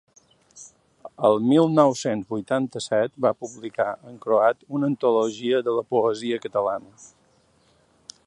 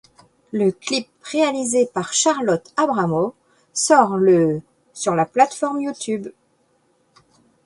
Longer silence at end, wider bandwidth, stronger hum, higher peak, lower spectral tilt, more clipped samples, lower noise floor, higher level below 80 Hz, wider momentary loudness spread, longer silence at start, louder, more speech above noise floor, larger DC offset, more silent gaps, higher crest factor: second, 1.2 s vs 1.35 s; about the same, 11.5 kHz vs 11.5 kHz; neither; about the same, -2 dBFS vs 0 dBFS; first, -6 dB/octave vs -4 dB/octave; neither; about the same, -62 dBFS vs -63 dBFS; second, -70 dBFS vs -62 dBFS; about the same, 9 LU vs 11 LU; about the same, 0.55 s vs 0.55 s; second, -23 LUFS vs -19 LUFS; second, 39 dB vs 44 dB; neither; neither; about the same, 22 dB vs 20 dB